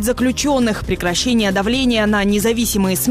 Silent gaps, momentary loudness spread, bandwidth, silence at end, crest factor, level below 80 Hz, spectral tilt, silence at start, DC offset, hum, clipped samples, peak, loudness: none; 2 LU; 16 kHz; 0 s; 8 dB; -32 dBFS; -4 dB/octave; 0 s; under 0.1%; none; under 0.1%; -8 dBFS; -16 LUFS